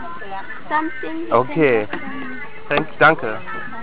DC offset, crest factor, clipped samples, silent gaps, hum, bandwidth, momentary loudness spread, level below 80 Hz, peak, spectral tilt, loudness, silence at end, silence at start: 4%; 20 dB; under 0.1%; none; none; 4 kHz; 16 LU; -56 dBFS; 0 dBFS; -9 dB/octave; -19 LUFS; 0 s; 0 s